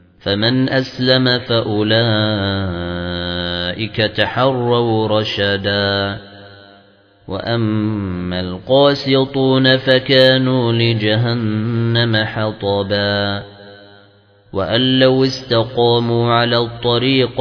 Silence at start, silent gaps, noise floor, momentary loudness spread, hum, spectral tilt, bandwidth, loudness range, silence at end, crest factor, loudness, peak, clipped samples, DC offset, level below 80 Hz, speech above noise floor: 0.25 s; none; -49 dBFS; 10 LU; none; -7 dB/octave; 5.4 kHz; 5 LU; 0 s; 16 dB; -15 LUFS; 0 dBFS; under 0.1%; under 0.1%; -48 dBFS; 34 dB